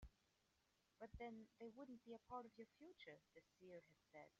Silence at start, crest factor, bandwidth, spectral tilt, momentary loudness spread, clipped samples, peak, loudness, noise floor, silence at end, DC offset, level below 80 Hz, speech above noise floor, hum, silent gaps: 0 s; 20 dB; 7.2 kHz; -4.5 dB/octave; 9 LU; under 0.1%; -42 dBFS; -61 LUFS; -85 dBFS; 0.1 s; under 0.1%; -74 dBFS; 24 dB; none; none